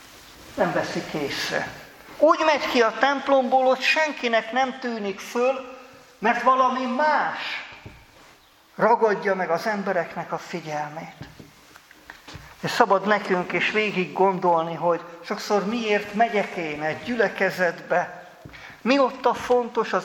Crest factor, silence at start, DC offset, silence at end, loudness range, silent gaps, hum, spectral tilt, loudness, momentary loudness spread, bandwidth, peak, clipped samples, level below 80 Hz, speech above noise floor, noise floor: 22 dB; 0 s; under 0.1%; 0 s; 5 LU; none; none; -4.5 dB/octave; -23 LUFS; 15 LU; 17.5 kHz; 0 dBFS; under 0.1%; -62 dBFS; 31 dB; -54 dBFS